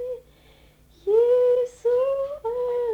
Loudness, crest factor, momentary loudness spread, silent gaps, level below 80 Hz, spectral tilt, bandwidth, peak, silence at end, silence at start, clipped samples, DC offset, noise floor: -22 LUFS; 12 dB; 15 LU; none; -58 dBFS; -5 dB/octave; 8.4 kHz; -10 dBFS; 0 s; 0 s; under 0.1%; under 0.1%; -54 dBFS